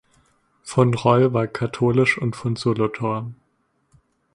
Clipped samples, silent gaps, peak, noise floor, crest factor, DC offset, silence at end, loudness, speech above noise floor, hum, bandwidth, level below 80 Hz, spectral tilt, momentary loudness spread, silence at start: under 0.1%; none; -2 dBFS; -68 dBFS; 20 dB; under 0.1%; 1 s; -21 LUFS; 48 dB; none; 11 kHz; -56 dBFS; -7 dB/octave; 9 LU; 0.65 s